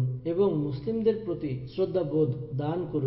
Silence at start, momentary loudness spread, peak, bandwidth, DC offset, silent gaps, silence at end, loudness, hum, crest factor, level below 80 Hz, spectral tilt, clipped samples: 0 s; 6 LU; -12 dBFS; 5.8 kHz; under 0.1%; none; 0 s; -29 LUFS; none; 16 dB; -56 dBFS; -12.5 dB/octave; under 0.1%